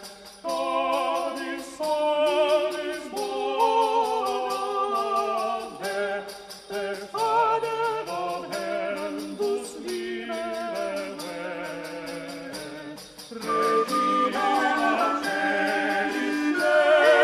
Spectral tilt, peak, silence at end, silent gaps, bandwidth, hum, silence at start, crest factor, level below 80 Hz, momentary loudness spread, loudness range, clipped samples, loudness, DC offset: -3 dB/octave; -8 dBFS; 0 s; none; 14 kHz; none; 0 s; 18 dB; -66 dBFS; 13 LU; 8 LU; under 0.1%; -26 LUFS; under 0.1%